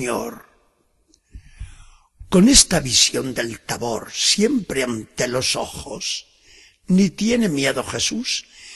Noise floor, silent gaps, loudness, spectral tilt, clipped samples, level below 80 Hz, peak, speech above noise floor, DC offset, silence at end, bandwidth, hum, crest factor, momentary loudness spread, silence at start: -63 dBFS; none; -19 LUFS; -3 dB/octave; under 0.1%; -40 dBFS; 0 dBFS; 43 dB; under 0.1%; 0 s; 12.5 kHz; none; 22 dB; 14 LU; 0 s